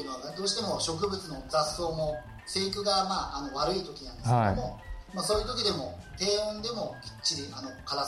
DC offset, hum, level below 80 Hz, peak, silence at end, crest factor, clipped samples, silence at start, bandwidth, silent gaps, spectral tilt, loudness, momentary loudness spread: under 0.1%; none; -48 dBFS; -14 dBFS; 0 s; 16 dB; under 0.1%; 0 s; 14.5 kHz; none; -4 dB/octave; -31 LUFS; 12 LU